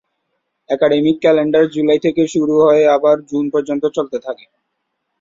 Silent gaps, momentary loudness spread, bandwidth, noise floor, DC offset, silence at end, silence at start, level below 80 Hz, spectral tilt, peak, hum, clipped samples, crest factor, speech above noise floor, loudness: none; 12 LU; 7.8 kHz; -72 dBFS; under 0.1%; 0.85 s; 0.7 s; -58 dBFS; -6 dB/octave; -2 dBFS; none; under 0.1%; 14 dB; 58 dB; -14 LUFS